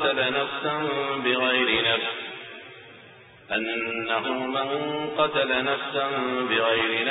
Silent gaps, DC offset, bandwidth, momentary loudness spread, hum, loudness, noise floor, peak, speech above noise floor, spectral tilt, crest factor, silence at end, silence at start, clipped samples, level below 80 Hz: none; under 0.1%; 4.1 kHz; 11 LU; none; -24 LUFS; -49 dBFS; -8 dBFS; 24 dB; -0.5 dB/octave; 18 dB; 0 s; 0 s; under 0.1%; -62 dBFS